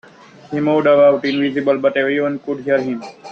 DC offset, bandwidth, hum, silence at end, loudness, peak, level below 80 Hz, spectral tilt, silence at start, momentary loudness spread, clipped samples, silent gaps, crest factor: under 0.1%; 6.6 kHz; none; 0 s; -16 LUFS; -2 dBFS; -62 dBFS; -7 dB/octave; 0.5 s; 12 LU; under 0.1%; none; 14 dB